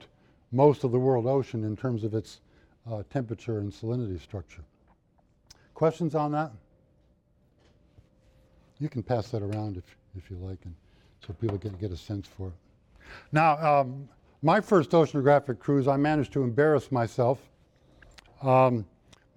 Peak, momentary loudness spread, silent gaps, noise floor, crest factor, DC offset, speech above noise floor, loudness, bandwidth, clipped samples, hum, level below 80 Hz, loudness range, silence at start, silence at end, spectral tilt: -8 dBFS; 19 LU; none; -66 dBFS; 20 dB; under 0.1%; 39 dB; -27 LUFS; 11 kHz; under 0.1%; none; -58 dBFS; 12 LU; 0.5 s; 0.5 s; -8 dB/octave